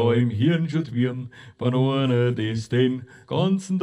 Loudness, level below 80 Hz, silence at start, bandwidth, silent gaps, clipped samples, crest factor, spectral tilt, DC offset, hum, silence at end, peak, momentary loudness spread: -23 LUFS; -62 dBFS; 0 s; 10.5 kHz; none; under 0.1%; 14 dB; -7.5 dB/octave; under 0.1%; none; 0 s; -8 dBFS; 8 LU